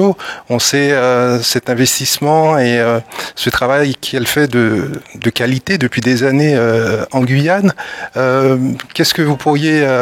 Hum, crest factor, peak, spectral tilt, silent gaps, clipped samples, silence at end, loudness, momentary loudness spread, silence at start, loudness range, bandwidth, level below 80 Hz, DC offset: none; 14 dB; 0 dBFS; -4.5 dB/octave; none; under 0.1%; 0 s; -13 LUFS; 7 LU; 0 s; 2 LU; 16.5 kHz; -48 dBFS; under 0.1%